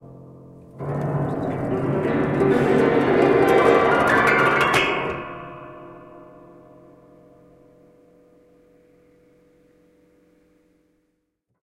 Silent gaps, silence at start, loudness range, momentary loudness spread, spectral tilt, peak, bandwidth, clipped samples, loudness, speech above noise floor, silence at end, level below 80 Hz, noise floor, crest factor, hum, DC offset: none; 0.1 s; 10 LU; 20 LU; -6 dB/octave; -4 dBFS; 14.5 kHz; under 0.1%; -19 LUFS; 54 dB; 5.4 s; -52 dBFS; -74 dBFS; 20 dB; none; under 0.1%